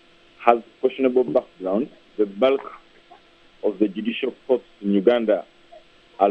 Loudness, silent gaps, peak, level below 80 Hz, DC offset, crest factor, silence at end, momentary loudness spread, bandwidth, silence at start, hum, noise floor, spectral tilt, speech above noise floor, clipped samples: -22 LUFS; none; 0 dBFS; -64 dBFS; under 0.1%; 22 dB; 0 s; 8 LU; 5.6 kHz; 0.4 s; none; -52 dBFS; -8 dB/octave; 31 dB; under 0.1%